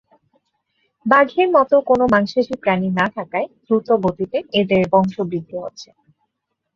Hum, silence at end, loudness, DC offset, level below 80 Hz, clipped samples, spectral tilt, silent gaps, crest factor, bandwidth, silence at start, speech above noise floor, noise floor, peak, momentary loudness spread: none; 0.9 s; -18 LUFS; under 0.1%; -54 dBFS; under 0.1%; -7 dB/octave; none; 18 dB; 7.2 kHz; 1.05 s; 59 dB; -76 dBFS; -2 dBFS; 10 LU